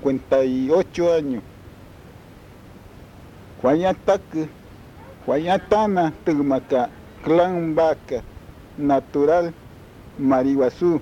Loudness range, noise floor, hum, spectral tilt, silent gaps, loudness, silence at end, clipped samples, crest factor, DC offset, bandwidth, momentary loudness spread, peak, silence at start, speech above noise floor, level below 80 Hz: 5 LU; -44 dBFS; none; -7 dB/octave; none; -21 LUFS; 0 s; under 0.1%; 16 dB; under 0.1%; 15.5 kHz; 11 LU; -4 dBFS; 0 s; 24 dB; -50 dBFS